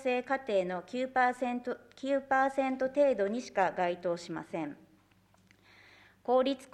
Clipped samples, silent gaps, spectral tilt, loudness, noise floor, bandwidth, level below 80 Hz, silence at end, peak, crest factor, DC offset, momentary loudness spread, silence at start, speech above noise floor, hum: under 0.1%; none; -5 dB/octave; -32 LUFS; -66 dBFS; 11 kHz; -72 dBFS; 0.1 s; -14 dBFS; 18 dB; under 0.1%; 11 LU; 0 s; 35 dB; none